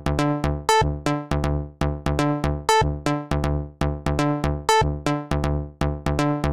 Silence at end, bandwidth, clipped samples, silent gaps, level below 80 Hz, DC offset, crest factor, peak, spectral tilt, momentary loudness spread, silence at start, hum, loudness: 0 s; 16 kHz; under 0.1%; none; -30 dBFS; 0.4%; 18 dB; -6 dBFS; -5.5 dB/octave; 6 LU; 0 s; none; -23 LUFS